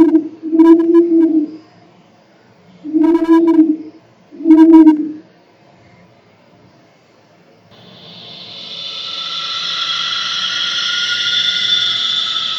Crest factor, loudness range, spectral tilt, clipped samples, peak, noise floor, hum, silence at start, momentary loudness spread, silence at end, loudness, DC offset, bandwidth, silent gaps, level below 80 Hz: 14 dB; 14 LU; -3 dB/octave; 0.2%; 0 dBFS; -49 dBFS; none; 0 s; 18 LU; 0 s; -12 LUFS; under 0.1%; 7.4 kHz; none; -60 dBFS